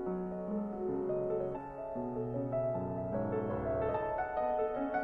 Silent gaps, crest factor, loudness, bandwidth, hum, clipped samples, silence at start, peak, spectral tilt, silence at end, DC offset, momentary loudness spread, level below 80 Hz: none; 14 dB; -36 LUFS; 4.7 kHz; none; under 0.1%; 0 s; -22 dBFS; -10.5 dB/octave; 0 s; under 0.1%; 5 LU; -56 dBFS